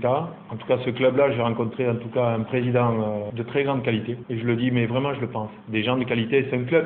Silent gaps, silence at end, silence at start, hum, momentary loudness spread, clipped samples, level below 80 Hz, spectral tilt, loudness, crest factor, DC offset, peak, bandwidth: none; 0 s; 0 s; none; 7 LU; under 0.1%; -60 dBFS; -11.5 dB/octave; -24 LUFS; 16 dB; under 0.1%; -6 dBFS; 4.2 kHz